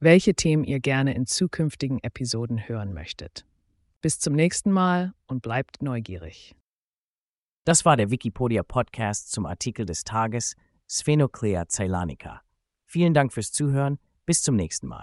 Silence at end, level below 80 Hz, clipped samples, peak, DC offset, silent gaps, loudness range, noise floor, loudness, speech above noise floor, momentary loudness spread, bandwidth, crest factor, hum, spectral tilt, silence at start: 0 s; -50 dBFS; under 0.1%; -4 dBFS; under 0.1%; 3.96-4.01 s, 6.61-7.14 s, 7.20-7.63 s; 3 LU; under -90 dBFS; -25 LUFS; over 66 dB; 12 LU; 11.5 kHz; 20 dB; none; -5 dB/octave; 0 s